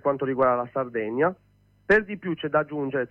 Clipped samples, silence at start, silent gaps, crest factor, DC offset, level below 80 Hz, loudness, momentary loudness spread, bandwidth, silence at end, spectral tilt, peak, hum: under 0.1%; 0.05 s; none; 16 dB; under 0.1%; -58 dBFS; -25 LUFS; 7 LU; 7.6 kHz; 0.05 s; -8 dB/octave; -8 dBFS; 50 Hz at -65 dBFS